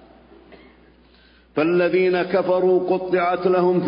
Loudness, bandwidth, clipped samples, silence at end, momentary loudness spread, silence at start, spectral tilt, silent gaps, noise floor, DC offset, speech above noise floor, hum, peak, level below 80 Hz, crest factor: -19 LUFS; 5.4 kHz; under 0.1%; 0 s; 3 LU; 0.5 s; -11.5 dB/octave; none; -53 dBFS; under 0.1%; 34 dB; none; -8 dBFS; -58 dBFS; 14 dB